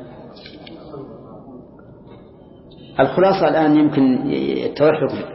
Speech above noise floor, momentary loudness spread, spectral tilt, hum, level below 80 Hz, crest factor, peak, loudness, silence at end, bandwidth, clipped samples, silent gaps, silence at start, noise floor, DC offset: 27 dB; 24 LU; -10.5 dB/octave; none; -52 dBFS; 16 dB; -2 dBFS; -17 LUFS; 0 s; 5.8 kHz; under 0.1%; none; 0 s; -43 dBFS; under 0.1%